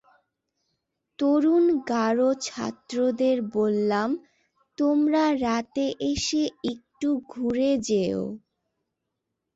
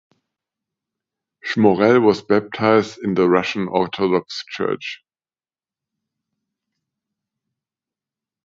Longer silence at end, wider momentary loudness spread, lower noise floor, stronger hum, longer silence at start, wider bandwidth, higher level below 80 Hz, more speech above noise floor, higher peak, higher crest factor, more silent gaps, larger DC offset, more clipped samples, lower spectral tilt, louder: second, 1.15 s vs 3.5 s; second, 10 LU vs 14 LU; second, -82 dBFS vs under -90 dBFS; neither; second, 1.2 s vs 1.45 s; about the same, 8 kHz vs 7.6 kHz; about the same, -56 dBFS vs -60 dBFS; second, 58 dB vs over 72 dB; second, -12 dBFS vs 0 dBFS; second, 14 dB vs 20 dB; neither; neither; neither; second, -5 dB/octave vs -6.5 dB/octave; second, -25 LUFS vs -18 LUFS